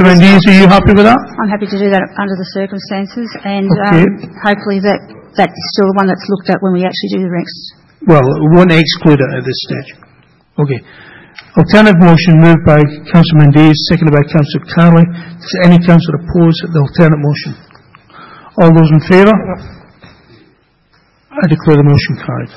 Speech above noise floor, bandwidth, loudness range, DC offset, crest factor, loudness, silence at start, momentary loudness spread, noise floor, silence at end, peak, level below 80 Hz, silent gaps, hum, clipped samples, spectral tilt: 43 dB; 7.4 kHz; 6 LU; under 0.1%; 8 dB; -9 LUFS; 0 s; 14 LU; -51 dBFS; 0.1 s; 0 dBFS; -34 dBFS; none; none; 2%; -8 dB/octave